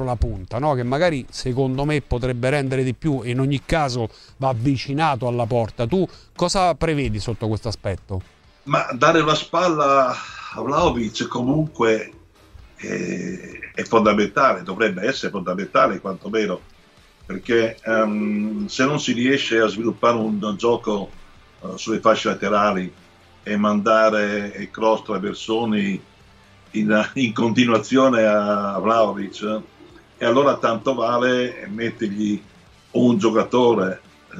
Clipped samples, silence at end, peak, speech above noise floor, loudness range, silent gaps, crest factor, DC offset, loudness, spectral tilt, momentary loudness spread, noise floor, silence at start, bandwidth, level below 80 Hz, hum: under 0.1%; 0 s; -2 dBFS; 31 dB; 3 LU; none; 20 dB; under 0.1%; -20 LUFS; -5.5 dB/octave; 11 LU; -51 dBFS; 0 s; 11 kHz; -42 dBFS; none